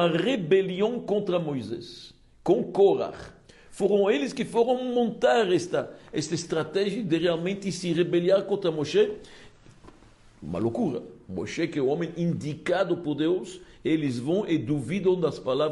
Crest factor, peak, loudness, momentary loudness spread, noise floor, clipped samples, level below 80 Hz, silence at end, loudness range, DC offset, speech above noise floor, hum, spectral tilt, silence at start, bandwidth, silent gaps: 16 dB; -10 dBFS; -26 LUFS; 11 LU; -54 dBFS; under 0.1%; -60 dBFS; 0 s; 5 LU; under 0.1%; 28 dB; none; -6 dB/octave; 0 s; 11.5 kHz; none